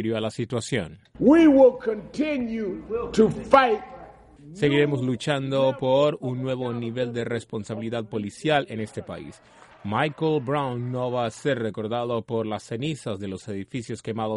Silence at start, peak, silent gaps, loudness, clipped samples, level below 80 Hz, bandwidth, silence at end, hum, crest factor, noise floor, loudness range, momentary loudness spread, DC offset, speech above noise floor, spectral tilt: 0 s; -4 dBFS; none; -24 LUFS; under 0.1%; -56 dBFS; 11.5 kHz; 0 s; none; 22 dB; -46 dBFS; 8 LU; 15 LU; under 0.1%; 23 dB; -6.5 dB/octave